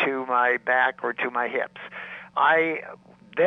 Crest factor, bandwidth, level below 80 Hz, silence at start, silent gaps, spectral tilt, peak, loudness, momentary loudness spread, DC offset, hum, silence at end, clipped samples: 16 dB; 6.4 kHz; -74 dBFS; 0 s; none; -6 dB/octave; -8 dBFS; -23 LUFS; 16 LU; under 0.1%; none; 0 s; under 0.1%